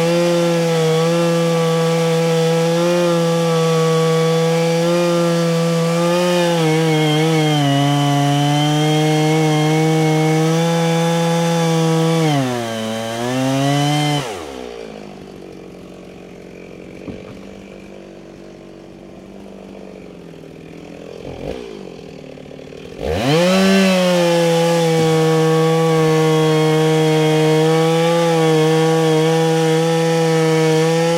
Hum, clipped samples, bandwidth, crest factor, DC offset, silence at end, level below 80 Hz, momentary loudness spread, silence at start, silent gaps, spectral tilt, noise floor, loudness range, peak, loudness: none; under 0.1%; 16 kHz; 14 dB; under 0.1%; 0 s; -50 dBFS; 21 LU; 0 s; none; -5.5 dB/octave; -37 dBFS; 21 LU; -2 dBFS; -15 LUFS